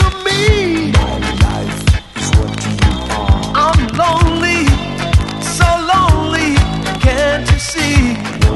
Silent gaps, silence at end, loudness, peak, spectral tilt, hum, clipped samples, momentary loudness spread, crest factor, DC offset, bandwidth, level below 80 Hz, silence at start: none; 0 s; -13 LUFS; 0 dBFS; -5 dB/octave; none; under 0.1%; 5 LU; 12 dB; 0.2%; 12 kHz; -18 dBFS; 0 s